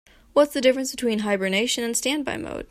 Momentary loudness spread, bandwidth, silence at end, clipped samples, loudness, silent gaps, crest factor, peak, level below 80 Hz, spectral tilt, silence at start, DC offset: 6 LU; 16 kHz; 0.05 s; under 0.1%; -23 LUFS; none; 18 dB; -6 dBFS; -54 dBFS; -3 dB/octave; 0.35 s; under 0.1%